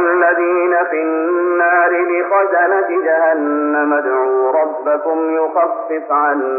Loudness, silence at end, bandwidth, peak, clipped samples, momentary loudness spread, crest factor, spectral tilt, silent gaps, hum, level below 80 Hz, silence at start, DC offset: -15 LUFS; 0 s; 2.9 kHz; -2 dBFS; under 0.1%; 4 LU; 12 dB; -4 dB/octave; none; none; -86 dBFS; 0 s; under 0.1%